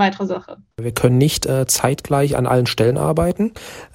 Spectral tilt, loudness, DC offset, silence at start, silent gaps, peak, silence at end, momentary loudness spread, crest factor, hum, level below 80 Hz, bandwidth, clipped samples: -5 dB/octave; -18 LUFS; under 0.1%; 0 s; none; 0 dBFS; 0.1 s; 11 LU; 18 dB; none; -40 dBFS; 16.5 kHz; under 0.1%